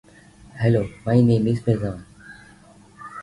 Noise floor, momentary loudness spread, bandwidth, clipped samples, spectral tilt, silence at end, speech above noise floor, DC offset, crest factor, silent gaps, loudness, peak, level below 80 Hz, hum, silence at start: -49 dBFS; 21 LU; 11 kHz; under 0.1%; -9 dB/octave; 0 s; 30 dB; under 0.1%; 18 dB; none; -21 LUFS; -4 dBFS; -48 dBFS; none; 0.55 s